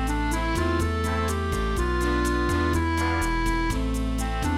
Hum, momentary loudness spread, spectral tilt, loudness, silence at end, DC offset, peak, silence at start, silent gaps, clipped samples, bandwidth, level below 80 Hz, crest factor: none; 3 LU; -5.5 dB/octave; -25 LUFS; 0 s; under 0.1%; -12 dBFS; 0 s; none; under 0.1%; 15 kHz; -28 dBFS; 12 dB